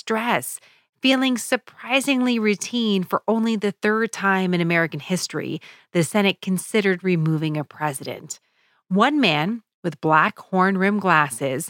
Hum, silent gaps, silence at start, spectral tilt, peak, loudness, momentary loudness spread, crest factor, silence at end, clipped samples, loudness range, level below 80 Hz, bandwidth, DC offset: none; 9.74-9.83 s; 0.05 s; -4.5 dB/octave; -4 dBFS; -21 LUFS; 11 LU; 18 dB; 0 s; under 0.1%; 3 LU; -74 dBFS; 17 kHz; under 0.1%